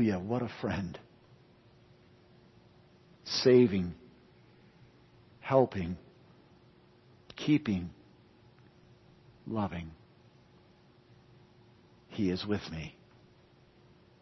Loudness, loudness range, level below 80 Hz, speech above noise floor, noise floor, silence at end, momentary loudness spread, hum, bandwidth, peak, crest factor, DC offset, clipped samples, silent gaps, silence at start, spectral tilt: -31 LUFS; 13 LU; -62 dBFS; 32 dB; -62 dBFS; 1.3 s; 23 LU; none; 6 kHz; -12 dBFS; 24 dB; under 0.1%; under 0.1%; none; 0 s; -5.5 dB/octave